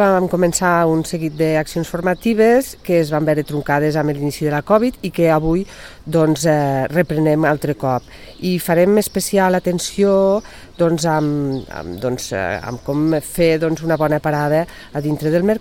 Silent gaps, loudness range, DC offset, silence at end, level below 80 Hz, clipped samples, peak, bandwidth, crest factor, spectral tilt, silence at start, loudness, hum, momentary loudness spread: none; 2 LU; 0.4%; 0 s; -42 dBFS; under 0.1%; -2 dBFS; 17 kHz; 16 dB; -6 dB/octave; 0 s; -17 LUFS; none; 8 LU